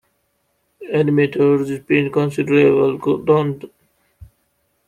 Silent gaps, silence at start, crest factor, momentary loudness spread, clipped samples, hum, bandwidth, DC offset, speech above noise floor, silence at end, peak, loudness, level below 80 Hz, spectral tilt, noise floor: none; 0.8 s; 16 dB; 9 LU; under 0.1%; none; 10.5 kHz; under 0.1%; 51 dB; 0.65 s; -2 dBFS; -17 LUFS; -56 dBFS; -8 dB/octave; -67 dBFS